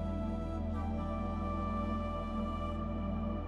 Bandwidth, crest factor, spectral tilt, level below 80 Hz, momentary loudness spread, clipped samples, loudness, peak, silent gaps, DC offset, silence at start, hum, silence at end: 7 kHz; 12 dB; -9 dB/octave; -42 dBFS; 2 LU; under 0.1%; -38 LUFS; -24 dBFS; none; under 0.1%; 0 s; none; 0 s